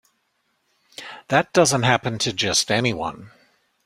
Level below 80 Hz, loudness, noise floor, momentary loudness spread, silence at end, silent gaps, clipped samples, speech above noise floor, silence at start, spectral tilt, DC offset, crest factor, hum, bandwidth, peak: -56 dBFS; -20 LUFS; -70 dBFS; 20 LU; 0.55 s; none; under 0.1%; 50 dB; 1 s; -3.5 dB/octave; under 0.1%; 22 dB; none; 16 kHz; -2 dBFS